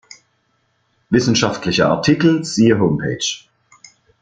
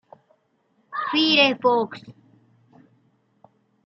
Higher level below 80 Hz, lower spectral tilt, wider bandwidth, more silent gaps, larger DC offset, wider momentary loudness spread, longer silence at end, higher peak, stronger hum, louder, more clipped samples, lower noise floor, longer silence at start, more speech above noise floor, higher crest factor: first, -50 dBFS vs -78 dBFS; about the same, -5 dB/octave vs -4.5 dB/octave; first, 9.4 kHz vs 6.4 kHz; neither; neither; second, 7 LU vs 17 LU; second, 0.85 s vs 1.75 s; first, 0 dBFS vs -4 dBFS; neither; first, -16 LUFS vs -20 LUFS; neither; about the same, -64 dBFS vs -67 dBFS; first, 1.1 s vs 0.9 s; about the same, 49 dB vs 47 dB; about the same, 18 dB vs 22 dB